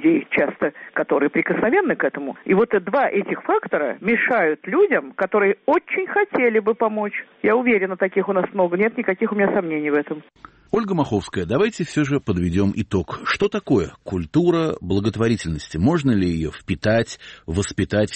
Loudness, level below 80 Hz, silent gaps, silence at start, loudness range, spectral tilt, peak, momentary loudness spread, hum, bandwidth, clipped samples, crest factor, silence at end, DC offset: -21 LUFS; -46 dBFS; none; 0 s; 3 LU; -6.5 dB/octave; -6 dBFS; 6 LU; none; 8.8 kHz; under 0.1%; 14 dB; 0 s; under 0.1%